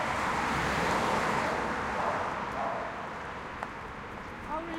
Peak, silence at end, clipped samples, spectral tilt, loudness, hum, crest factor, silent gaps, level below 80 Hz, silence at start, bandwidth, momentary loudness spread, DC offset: -16 dBFS; 0 s; under 0.1%; -4.5 dB/octave; -32 LUFS; none; 16 dB; none; -50 dBFS; 0 s; 16.5 kHz; 12 LU; under 0.1%